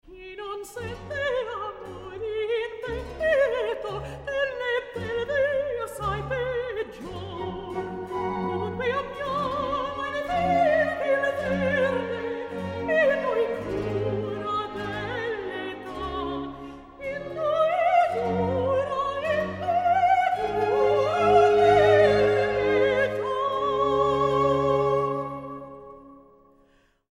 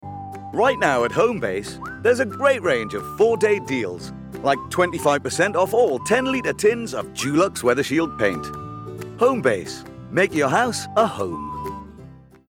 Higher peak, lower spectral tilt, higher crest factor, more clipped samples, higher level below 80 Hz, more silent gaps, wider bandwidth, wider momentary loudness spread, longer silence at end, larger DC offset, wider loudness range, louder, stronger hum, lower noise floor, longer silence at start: second, -6 dBFS vs -2 dBFS; first, -6 dB/octave vs -4.5 dB/octave; about the same, 20 dB vs 18 dB; neither; about the same, -50 dBFS vs -52 dBFS; neither; second, 13 kHz vs 17.5 kHz; about the same, 14 LU vs 15 LU; first, 0.9 s vs 0.3 s; neither; first, 9 LU vs 2 LU; second, -25 LUFS vs -21 LUFS; neither; first, -62 dBFS vs -44 dBFS; about the same, 0.05 s vs 0.05 s